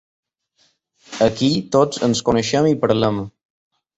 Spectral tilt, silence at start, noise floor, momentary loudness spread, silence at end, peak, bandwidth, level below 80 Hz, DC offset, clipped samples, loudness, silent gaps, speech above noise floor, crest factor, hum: -5.5 dB/octave; 1.1 s; -63 dBFS; 8 LU; 0.7 s; -2 dBFS; 8.2 kHz; -50 dBFS; under 0.1%; under 0.1%; -18 LUFS; none; 46 dB; 18 dB; none